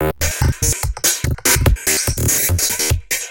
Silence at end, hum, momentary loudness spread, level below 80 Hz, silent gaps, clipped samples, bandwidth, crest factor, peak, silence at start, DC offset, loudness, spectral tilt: 0 s; none; 4 LU; -24 dBFS; none; under 0.1%; 17.5 kHz; 16 dB; -2 dBFS; 0 s; under 0.1%; -16 LUFS; -3 dB/octave